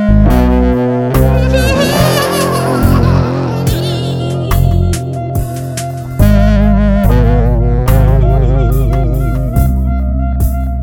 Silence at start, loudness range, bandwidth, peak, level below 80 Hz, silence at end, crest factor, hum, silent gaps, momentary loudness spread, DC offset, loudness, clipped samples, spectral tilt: 0 s; 3 LU; 18 kHz; 0 dBFS; -14 dBFS; 0 s; 10 dB; none; none; 7 LU; under 0.1%; -12 LUFS; 0.6%; -6.5 dB/octave